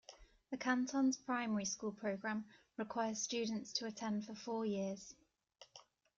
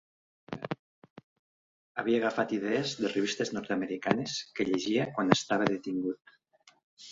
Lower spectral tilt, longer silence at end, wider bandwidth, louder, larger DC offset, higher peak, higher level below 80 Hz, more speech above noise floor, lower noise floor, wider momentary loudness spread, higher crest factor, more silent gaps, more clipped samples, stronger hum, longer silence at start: about the same, -3.5 dB/octave vs -4.5 dB/octave; first, 0.35 s vs 0 s; about the same, 7.6 kHz vs 8 kHz; second, -41 LUFS vs -31 LUFS; neither; second, -24 dBFS vs -4 dBFS; second, -78 dBFS vs -70 dBFS; second, 27 dB vs 34 dB; about the same, -67 dBFS vs -64 dBFS; first, 16 LU vs 13 LU; second, 18 dB vs 28 dB; second, none vs 0.79-1.02 s, 1.10-1.16 s, 1.24-1.95 s, 6.84-6.97 s; neither; neither; second, 0.1 s vs 0.5 s